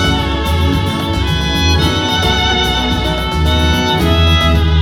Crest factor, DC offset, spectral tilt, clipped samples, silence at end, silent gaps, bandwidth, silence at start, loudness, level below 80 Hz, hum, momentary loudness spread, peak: 12 dB; under 0.1%; -5 dB/octave; under 0.1%; 0 s; none; 17 kHz; 0 s; -13 LUFS; -18 dBFS; none; 5 LU; 0 dBFS